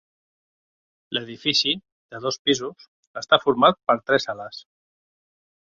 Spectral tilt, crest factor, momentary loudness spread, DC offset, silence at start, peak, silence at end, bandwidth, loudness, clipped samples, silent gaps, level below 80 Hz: -3.5 dB/octave; 24 dB; 19 LU; under 0.1%; 1.1 s; -2 dBFS; 1.05 s; 7.8 kHz; -22 LUFS; under 0.1%; 1.92-2.09 s, 2.39-2.45 s, 2.88-3.14 s; -64 dBFS